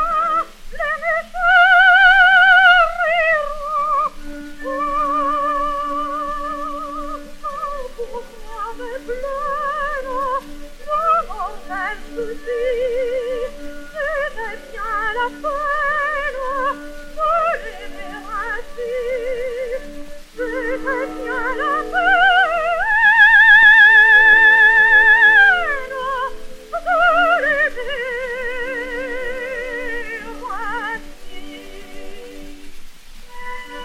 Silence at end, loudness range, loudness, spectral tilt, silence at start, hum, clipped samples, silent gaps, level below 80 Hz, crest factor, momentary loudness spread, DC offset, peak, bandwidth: 0 s; 17 LU; -15 LUFS; -2.5 dB/octave; 0 s; none; under 0.1%; none; -36 dBFS; 16 dB; 21 LU; under 0.1%; 0 dBFS; 15 kHz